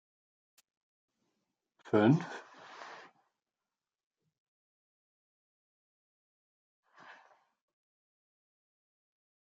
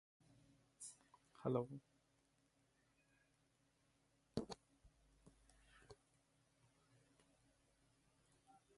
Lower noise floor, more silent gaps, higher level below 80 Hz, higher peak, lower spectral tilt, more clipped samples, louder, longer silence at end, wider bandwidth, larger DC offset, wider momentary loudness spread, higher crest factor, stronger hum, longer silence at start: first, under -90 dBFS vs -81 dBFS; neither; second, -84 dBFS vs -78 dBFS; first, -14 dBFS vs -28 dBFS; first, -8 dB/octave vs -6 dB/octave; neither; first, -29 LUFS vs -49 LUFS; first, 6.5 s vs 2.85 s; second, 7.8 kHz vs 11.5 kHz; neither; about the same, 25 LU vs 24 LU; about the same, 26 dB vs 28 dB; neither; first, 1.95 s vs 0.8 s